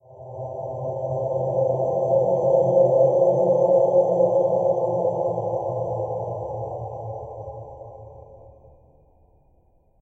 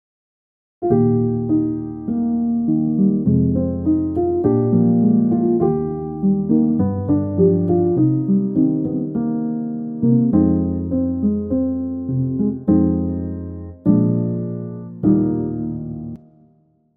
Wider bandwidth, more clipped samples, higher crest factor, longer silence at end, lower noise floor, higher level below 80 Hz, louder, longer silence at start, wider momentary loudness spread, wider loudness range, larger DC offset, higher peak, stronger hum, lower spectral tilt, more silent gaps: first, 6.4 kHz vs 2.1 kHz; neither; about the same, 16 dB vs 16 dB; first, 1.65 s vs 0.8 s; about the same, -59 dBFS vs -57 dBFS; second, -56 dBFS vs -44 dBFS; second, -22 LUFS vs -19 LUFS; second, 0.1 s vs 0.8 s; first, 18 LU vs 10 LU; first, 17 LU vs 3 LU; neither; second, -6 dBFS vs -2 dBFS; neither; second, -11 dB/octave vs -15.5 dB/octave; neither